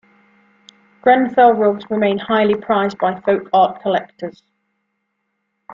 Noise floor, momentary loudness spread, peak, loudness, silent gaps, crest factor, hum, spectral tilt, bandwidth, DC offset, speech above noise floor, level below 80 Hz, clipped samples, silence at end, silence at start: -72 dBFS; 9 LU; -2 dBFS; -16 LUFS; none; 16 dB; none; -7 dB/octave; 7.2 kHz; under 0.1%; 56 dB; -60 dBFS; under 0.1%; 0 s; 1.05 s